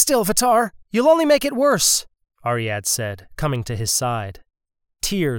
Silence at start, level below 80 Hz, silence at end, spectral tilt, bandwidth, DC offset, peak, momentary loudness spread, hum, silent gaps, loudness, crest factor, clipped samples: 0 s; -46 dBFS; 0 s; -3.5 dB/octave; over 20 kHz; under 0.1%; -2 dBFS; 11 LU; none; none; -19 LUFS; 18 dB; under 0.1%